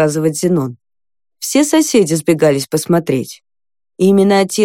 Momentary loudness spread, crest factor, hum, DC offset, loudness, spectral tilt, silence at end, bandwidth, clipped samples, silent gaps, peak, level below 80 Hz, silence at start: 8 LU; 14 dB; none; under 0.1%; -14 LUFS; -5 dB/octave; 0 s; 17 kHz; under 0.1%; none; 0 dBFS; -58 dBFS; 0 s